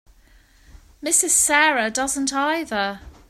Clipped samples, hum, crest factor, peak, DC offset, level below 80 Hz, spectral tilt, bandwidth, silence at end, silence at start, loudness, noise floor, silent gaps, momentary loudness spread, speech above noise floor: under 0.1%; none; 20 dB; -4 dBFS; under 0.1%; -50 dBFS; -0.5 dB/octave; 16 kHz; 0.2 s; 0.75 s; -19 LUFS; -53 dBFS; none; 10 LU; 33 dB